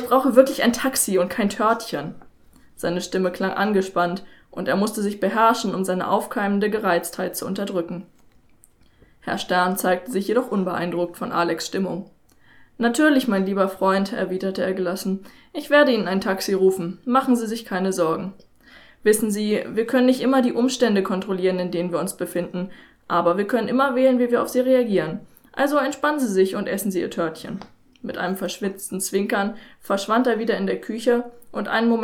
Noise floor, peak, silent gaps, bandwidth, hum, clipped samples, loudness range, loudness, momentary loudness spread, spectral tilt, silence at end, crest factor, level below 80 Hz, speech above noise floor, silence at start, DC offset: -54 dBFS; 0 dBFS; none; 18.5 kHz; none; under 0.1%; 4 LU; -22 LUFS; 11 LU; -5 dB/octave; 0 s; 22 dB; -60 dBFS; 33 dB; 0 s; under 0.1%